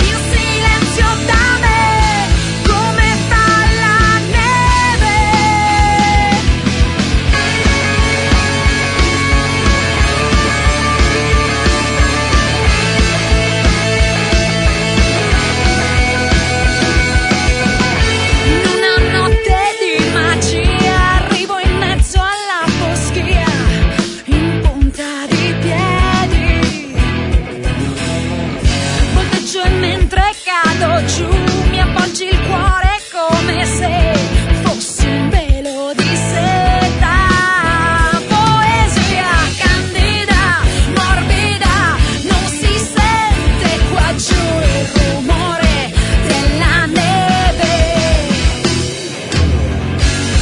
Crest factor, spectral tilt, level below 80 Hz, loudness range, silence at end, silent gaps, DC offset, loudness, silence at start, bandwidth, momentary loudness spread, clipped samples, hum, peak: 12 dB; -4.5 dB/octave; -18 dBFS; 3 LU; 0 s; none; under 0.1%; -13 LUFS; 0 s; 11 kHz; 4 LU; under 0.1%; none; 0 dBFS